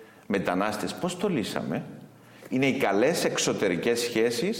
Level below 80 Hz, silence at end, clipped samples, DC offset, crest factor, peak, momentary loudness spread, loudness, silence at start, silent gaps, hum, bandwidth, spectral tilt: -64 dBFS; 0 s; under 0.1%; under 0.1%; 18 dB; -8 dBFS; 8 LU; -27 LUFS; 0 s; none; none; 17 kHz; -4 dB/octave